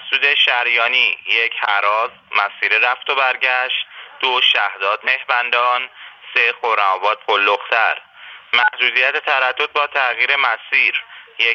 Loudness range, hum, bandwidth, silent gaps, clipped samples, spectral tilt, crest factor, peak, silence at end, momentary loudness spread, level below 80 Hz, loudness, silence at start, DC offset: 1 LU; none; 6.8 kHz; none; under 0.1%; 0 dB/octave; 18 dB; 0 dBFS; 0 s; 7 LU; -76 dBFS; -15 LUFS; 0 s; under 0.1%